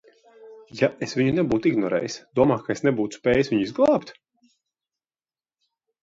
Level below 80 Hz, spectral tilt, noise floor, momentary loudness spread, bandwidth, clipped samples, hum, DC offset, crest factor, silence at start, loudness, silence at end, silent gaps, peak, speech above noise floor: -56 dBFS; -6.5 dB/octave; under -90 dBFS; 5 LU; 7.8 kHz; under 0.1%; none; under 0.1%; 20 dB; 0.4 s; -23 LUFS; 1.9 s; none; -4 dBFS; over 68 dB